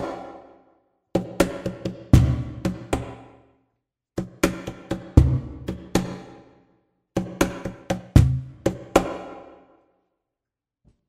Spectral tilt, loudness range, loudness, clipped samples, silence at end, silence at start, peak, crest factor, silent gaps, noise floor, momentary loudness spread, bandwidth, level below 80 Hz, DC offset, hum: -6.5 dB/octave; 1 LU; -24 LUFS; under 0.1%; 1.65 s; 0 s; 0 dBFS; 24 dB; none; -87 dBFS; 17 LU; 16 kHz; -32 dBFS; under 0.1%; none